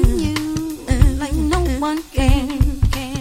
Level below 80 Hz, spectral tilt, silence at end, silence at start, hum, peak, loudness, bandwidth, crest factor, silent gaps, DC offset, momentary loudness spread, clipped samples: -20 dBFS; -6 dB/octave; 0 s; 0 s; none; 0 dBFS; -19 LUFS; 16 kHz; 16 dB; none; under 0.1%; 5 LU; under 0.1%